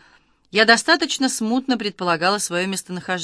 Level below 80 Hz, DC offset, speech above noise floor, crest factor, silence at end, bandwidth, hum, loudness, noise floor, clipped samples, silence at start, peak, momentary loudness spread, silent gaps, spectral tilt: -66 dBFS; under 0.1%; 36 dB; 20 dB; 0 s; 11 kHz; none; -19 LUFS; -56 dBFS; under 0.1%; 0.55 s; 0 dBFS; 10 LU; none; -2.5 dB/octave